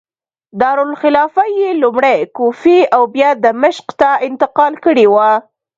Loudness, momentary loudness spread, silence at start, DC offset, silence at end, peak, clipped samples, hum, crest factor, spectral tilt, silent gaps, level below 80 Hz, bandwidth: -12 LUFS; 6 LU; 0.55 s; under 0.1%; 0.4 s; 0 dBFS; under 0.1%; none; 12 dB; -5.5 dB/octave; none; -56 dBFS; 7.6 kHz